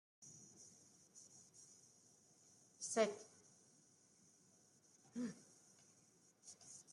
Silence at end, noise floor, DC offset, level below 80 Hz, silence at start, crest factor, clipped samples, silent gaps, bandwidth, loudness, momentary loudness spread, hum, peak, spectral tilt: 0 s; -73 dBFS; under 0.1%; under -90 dBFS; 0.2 s; 26 dB; under 0.1%; none; 13.5 kHz; -46 LUFS; 27 LU; none; -26 dBFS; -3 dB/octave